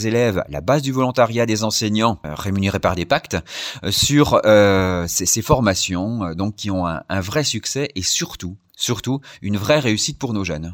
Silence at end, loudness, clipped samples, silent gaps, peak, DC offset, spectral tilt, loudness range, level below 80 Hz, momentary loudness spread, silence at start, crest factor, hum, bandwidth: 0 s; -19 LUFS; under 0.1%; none; -2 dBFS; under 0.1%; -4 dB/octave; 5 LU; -44 dBFS; 10 LU; 0 s; 16 dB; none; 17.5 kHz